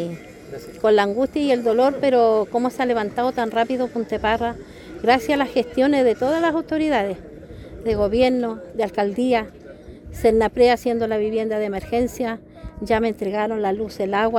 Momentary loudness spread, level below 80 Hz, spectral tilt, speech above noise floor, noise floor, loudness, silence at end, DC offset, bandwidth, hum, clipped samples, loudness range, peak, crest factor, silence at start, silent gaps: 17 LU; -44 dBFS; -5.5 dB/octave; 20 dB; -40 dBFS; -21 LUFS; 0 s; under 0.1%; 16.5 kHz; none; under 0.1%; 3 LU; -4 dBFS; 16 dB; 0 s; none